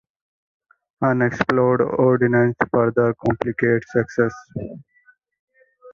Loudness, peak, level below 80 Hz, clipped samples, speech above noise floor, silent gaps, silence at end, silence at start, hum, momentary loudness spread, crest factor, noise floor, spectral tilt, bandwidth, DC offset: -19 LUFS; -2 dBFS; -52 dBFS; under 0.1%; 39 dB; 5.40-5.48 s; 0 s; 1 s; none; 7 LU; 18 dB; -58 dBFS; -8.5 dB/octave; 7 kHz; under 0.1%